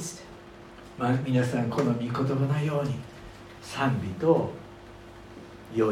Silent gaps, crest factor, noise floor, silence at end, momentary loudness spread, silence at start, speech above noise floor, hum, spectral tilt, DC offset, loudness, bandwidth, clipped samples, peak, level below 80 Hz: none; 20 dB; -47 dBFS; 0 s; 21 LU; 0 s; 21 dB; none; -7 dB/octave; under 0.1%; -28 LUFS; 14.5 kHz; under 0.1%; -10 dBFS; -56 dBFS